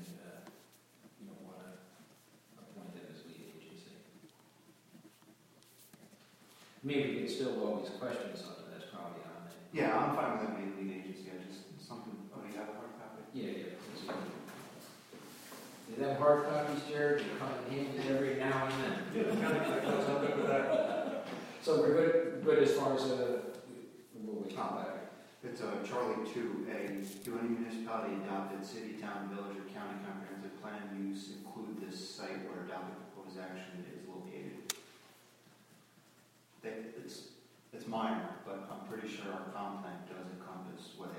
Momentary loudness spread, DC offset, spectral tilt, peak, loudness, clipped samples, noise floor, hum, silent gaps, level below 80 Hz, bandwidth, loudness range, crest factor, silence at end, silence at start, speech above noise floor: 21 LU; under 0.1%; -5.5 dB/octave; -16 dBFS; -38 LUFS; under 0.1%; -66 dBFS; none; none; -80 dBFS; 16.5 kHz; 17 LU; 24 dB; 0 s; 0 s; 30 dB